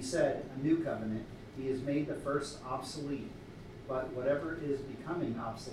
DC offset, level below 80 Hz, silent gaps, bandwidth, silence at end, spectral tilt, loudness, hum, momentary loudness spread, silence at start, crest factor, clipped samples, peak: under 0.1%; -58 dBFS; none; 14 kHz; 0 s; -6 dB/octave; -36 LUFS; none; 10 LU; 0 s; 18 dB; under 0.1%; -18 dBFS